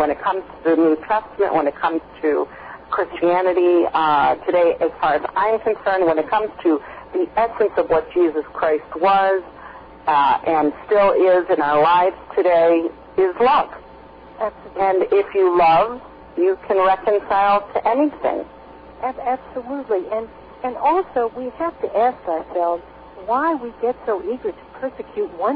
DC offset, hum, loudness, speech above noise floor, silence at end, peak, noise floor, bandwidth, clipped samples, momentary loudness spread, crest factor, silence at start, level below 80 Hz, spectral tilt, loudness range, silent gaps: under 0.1%; none; -19 LUFS; 23 dB; 0 s; -8 dBFS; -41 dBFS; 5.2 kHz; under 0.1%; 12 LU; 12 dB; 0 s; -52 dBFS; -8.5 dB/octave; 6 LU; none